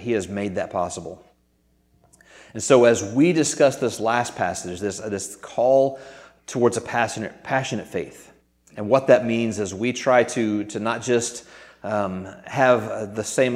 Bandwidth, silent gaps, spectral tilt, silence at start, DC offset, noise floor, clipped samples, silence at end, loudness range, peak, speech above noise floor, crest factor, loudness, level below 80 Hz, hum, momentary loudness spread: 15.5 kHz; none; -4.5 dB/octave; 0 s; under 0.1%; -64 dBFS; under 0.1%; 0 s; 3 LU; -2 dBFS; 42 dB; 20 dB; -22 LUFS; -62 dBFS; none; 14 LU